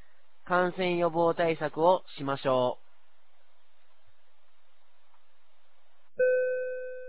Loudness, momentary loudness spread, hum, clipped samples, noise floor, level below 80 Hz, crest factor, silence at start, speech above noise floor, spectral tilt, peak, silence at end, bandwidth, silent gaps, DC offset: -28 LUFS; 9 LU; none; under 0.1%; -70 dBFS; -72 dBFS; 20 dB; 0.45 s; 43 dB; -9.5 dB/octave; -10 dBFS; 0 s; 4 kHz; none; 0.8%